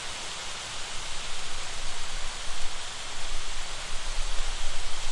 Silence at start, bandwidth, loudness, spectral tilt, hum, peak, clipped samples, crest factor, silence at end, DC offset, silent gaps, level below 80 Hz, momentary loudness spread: 0 s; 11.5 kHz; -35 LUFS; -1 dB/octave; none; -12 dBFS; under 0.1%; 12 dB; 0 s; under 0.1%; none; -34 dBFS; 1 LU